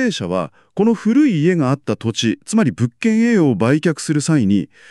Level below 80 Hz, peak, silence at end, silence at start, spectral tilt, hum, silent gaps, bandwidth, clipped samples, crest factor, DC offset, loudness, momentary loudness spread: -58 dBFS; -4 dBFS; 0.25 s; 0 s; -6 dB/octave; none; none; 11.5 kHz; under 0.1%; 12 dB; under 0.1%; -17 LUFS; 6 LU